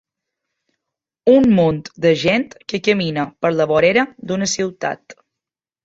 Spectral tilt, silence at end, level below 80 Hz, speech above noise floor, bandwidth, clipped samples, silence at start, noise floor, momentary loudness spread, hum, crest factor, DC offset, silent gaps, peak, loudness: -5 dB/octave; 0.7 s; -54 dBFS; 70 dB; 8 kHz; under 0.1%; 1.25 s; -86 dBFS; 9 LU; none; 18 dB; under 0.1%; none; -2 dBFS; -17 LUFS